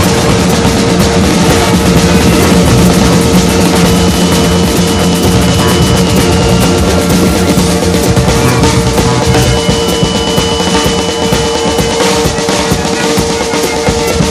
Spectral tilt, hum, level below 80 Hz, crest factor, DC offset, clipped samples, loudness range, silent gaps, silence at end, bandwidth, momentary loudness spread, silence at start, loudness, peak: -4.5 dB/octave; none; -20 dBFS; 8 dB; under 0.1%; 0.5%; 3 LU; none; 0 s; 16 kHz; 4 LU; 0 s; -8 LUFS; 0 dBFS